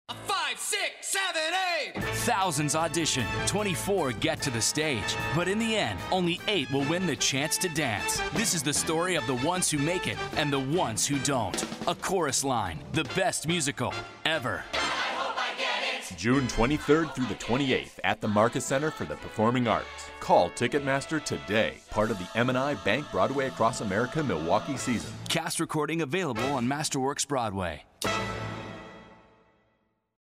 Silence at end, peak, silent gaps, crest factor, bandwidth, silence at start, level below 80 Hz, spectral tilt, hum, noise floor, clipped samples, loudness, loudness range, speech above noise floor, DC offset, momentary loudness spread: 1.15 s; -10 dBFS; none; 20 dB; 16 kHz; 0.1 s; -50 dBFS; -3.5 dB/octave; none; -73 dBFS; under 0.1%; -28 LUFS; 2 LU; 44 dB; under 0.1%; 6 LU